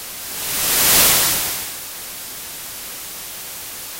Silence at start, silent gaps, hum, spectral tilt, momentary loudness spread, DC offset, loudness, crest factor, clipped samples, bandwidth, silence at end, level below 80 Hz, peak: 0 s; none; none; 0 dB/octave; 18 LU; under 0.1%; -15 LUFS; 20 dB; under 0.1%; 16.5 kHz; 0 s; -46 dBFS; 0 dBFS